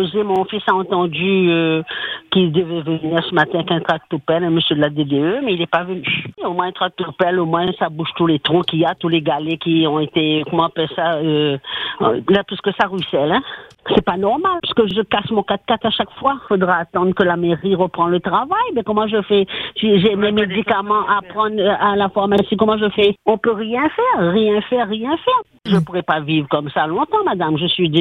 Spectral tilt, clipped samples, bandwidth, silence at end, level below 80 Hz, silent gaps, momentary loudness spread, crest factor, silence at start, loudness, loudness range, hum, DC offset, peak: -8 dB/octave; under 0.1%; 6 kHz; 0 s; -52 dBFS; none; 5 LU; 16 dB; 0 s; -17 LUFS; 2 LU; none; under 0.1%; 0 dBFS